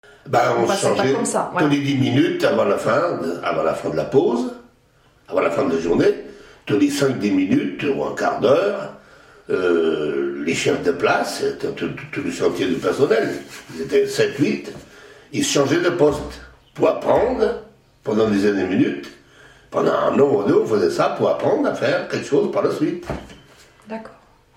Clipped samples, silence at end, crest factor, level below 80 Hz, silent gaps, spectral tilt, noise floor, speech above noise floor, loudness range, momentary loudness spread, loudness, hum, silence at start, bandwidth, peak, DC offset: under 0.1%; 0.45 s; 16 dB; -50 dBFS; none; -5 dB/octave; -56 dBFS; 37 dB; 3 LU; 12 LU; -19 LUFS; none; 0.25 s; 16 kHz; -4 dBFS; under 0.1%